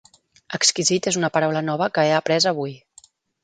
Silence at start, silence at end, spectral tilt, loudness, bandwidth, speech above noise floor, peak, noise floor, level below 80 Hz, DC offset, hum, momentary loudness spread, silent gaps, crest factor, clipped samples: 0.5 s; 0.65 s; -3 dB/octave; -20 LUFS; 9.6 kHz; 33 dB; -4 dBFS; -53 dBFS; -66 dBFS; under 0.1%; none; 8 LU; none; 18 dB; under 0.1%